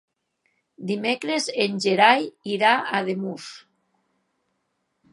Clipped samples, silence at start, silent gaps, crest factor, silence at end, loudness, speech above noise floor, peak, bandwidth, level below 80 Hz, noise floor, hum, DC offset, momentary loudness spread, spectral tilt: under 0.1%; 0.8 s; none; 24 dB; 1.55 s; -22 LUFS; 52 dB; -2 dBFS; 11.5 kHz; -80 dBFS; -75 dBFS; none; under 0.1%; 16 LU; -4 dB/octave